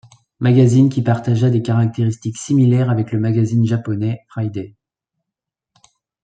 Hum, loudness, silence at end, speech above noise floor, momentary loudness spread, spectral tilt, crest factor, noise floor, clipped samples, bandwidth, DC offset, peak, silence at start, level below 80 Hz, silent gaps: none; -17 LUFS; 1.55 s; 68 dB; 12 LU; -8 dB/octave; 14 dB; -84 dBFS; under 0.1%; 9.2 kHz; under 0.1%; -2 dBFS; 0.4 s; -56 dBFS; none